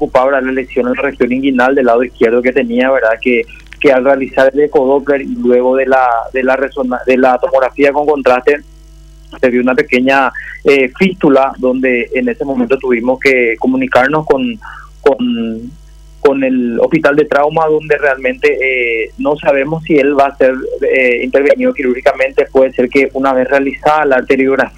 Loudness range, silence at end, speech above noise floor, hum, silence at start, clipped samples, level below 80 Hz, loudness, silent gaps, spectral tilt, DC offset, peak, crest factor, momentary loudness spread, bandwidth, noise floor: 2 LU; 0.1 s; 25 dB; none; 0 s; under 0.1%; -40 dBFS; -11 LUFS; none; -6.5 dB/octave; under 0.1%; 0 dBFS; 12 dB; 5 LU; 11 kHz; -36 dBFS